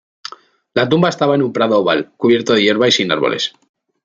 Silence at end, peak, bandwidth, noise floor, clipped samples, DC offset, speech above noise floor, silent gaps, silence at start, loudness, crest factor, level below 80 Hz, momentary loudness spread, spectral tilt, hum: 0.55 s; 0 dBFS; 7.6 kHz; -40 dBFS; under 0.1%; under 0.1%; 25 dB; none; 0.75 s; -15 LUFS; 16 dB; -60 dBFS; 10 LU; -5 dB/octave; none